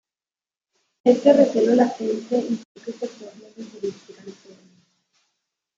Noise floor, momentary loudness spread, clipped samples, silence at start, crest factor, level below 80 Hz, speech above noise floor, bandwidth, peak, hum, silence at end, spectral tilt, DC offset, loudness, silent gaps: under -90 dBFS; 26 LU; under 0.1%; 1.05 s; 20 dB; -74 dBFS; over 69 dB; 7.8 kHz; -2 dBFS; none; 1.45 s; -6 dB/octave; under 0.1%; -20 LUFS; 2.65-2.75 s